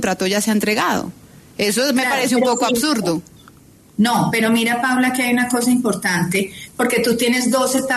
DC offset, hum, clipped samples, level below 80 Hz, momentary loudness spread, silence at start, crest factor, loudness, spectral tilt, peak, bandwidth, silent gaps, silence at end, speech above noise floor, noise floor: under 0.1%; none; under 0.1%; -54 dBFS; 6 LU; 0 s; 12 dB; -17 LUFS; -3.5 dB/octave; -6 dBFS; 13.5 kHz; none; 0 s; 29 dB; -47 dBFS